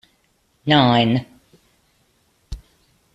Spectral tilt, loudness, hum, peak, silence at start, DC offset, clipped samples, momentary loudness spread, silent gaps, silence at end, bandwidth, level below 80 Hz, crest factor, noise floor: -7 dB/octave; -17 LUFS; none; -2 dBFS; 0.65 s; under 0.1%; under 0.1%; 25 LU; none; 0.55 s; 8.2 kHz; -46 dBFS; 20 dB; -64 dBFS